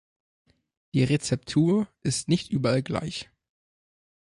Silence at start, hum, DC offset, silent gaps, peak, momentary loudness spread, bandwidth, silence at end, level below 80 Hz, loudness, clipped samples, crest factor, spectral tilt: 0.95 s; none; under 0.1%; none; -10 dBFS; 9 LU; 11.5 kHz; 1.05 s; -56 dBFS; -26 LUFS; under 0.1%; 18 dB; -5.5 dB/octave